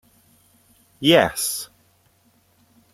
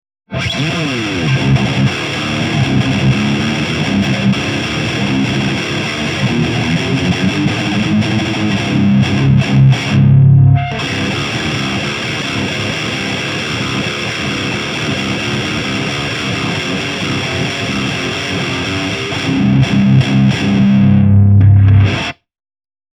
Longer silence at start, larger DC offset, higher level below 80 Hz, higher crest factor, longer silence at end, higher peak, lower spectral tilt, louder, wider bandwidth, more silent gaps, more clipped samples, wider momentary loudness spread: first, 1 s vs 0.3 s; neither; second, -58 dBFS vs -36 dBFS; first, 22 dB vs 12 dB; first, 1.3 s vs 0.8 s; about the same, -2 dBFS vs 0 dBFS; second, -3.5 dB/octave vs -6 dB/octave; second, -19 LUFS vs -14 LUFS; first, 16 kHz vs 10.5 kHz; neither; neither; first, 15 LU vs 8 LU